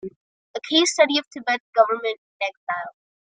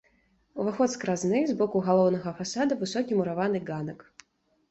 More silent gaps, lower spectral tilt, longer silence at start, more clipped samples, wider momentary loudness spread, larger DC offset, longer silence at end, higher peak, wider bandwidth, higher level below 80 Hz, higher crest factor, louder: first, 0.16-0.54 s, 1.27-1.31 s, 1.60-1.73 s, 2.18-2.40 s, 2.57-2.67 s vs none; second, -1 dB/octave vs -6 dB/octave; second, 0.05 s vs 0.55 s; neither; first, 17 LU vs 12 LU; neither; second, 0.4 s vs 0.75 s; first, -4 dBFS vs -10 dBFS; first, 9.6 kHz vs 8.2 kHz; second, -76 dBFS vs -66 dBFS; about the same, 20 dB vs 18 dB; first, -22 LUFS vs -27 LUFS